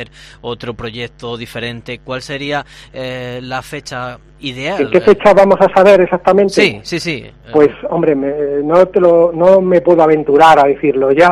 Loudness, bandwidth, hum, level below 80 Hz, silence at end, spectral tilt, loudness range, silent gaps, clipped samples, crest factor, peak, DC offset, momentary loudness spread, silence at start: -11 LUFS; 13 kHz; none; -44 dBFS; 0 s; -6 dB/octave; 13 LU; none; 0.2%; 12 dB; 0 dBFS; under 0.1%; 17 LU; 0 s